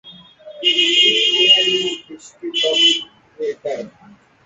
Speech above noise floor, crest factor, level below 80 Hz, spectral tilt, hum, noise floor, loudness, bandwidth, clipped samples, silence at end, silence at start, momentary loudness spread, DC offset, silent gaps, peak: 31 dB; 18 dB; -68 dBFS; -0.5 dB/octave; none; -48 dBFS; -13 LUFS; 8.2 kHz; under 0.1%; 0.55 s; 0.05 s; 17 LU; under 0.1%; none; -2 dBFS